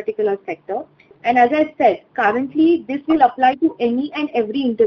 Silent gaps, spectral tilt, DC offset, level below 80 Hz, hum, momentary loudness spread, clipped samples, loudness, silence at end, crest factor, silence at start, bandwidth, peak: none; -7 dB/octave; under 0.1%; -60 dBFS; none; 11 LU; under 0.1%; -18 LUFS; 0 s; 16 dB; 0 s; 6.2 kHz; -2 dBFS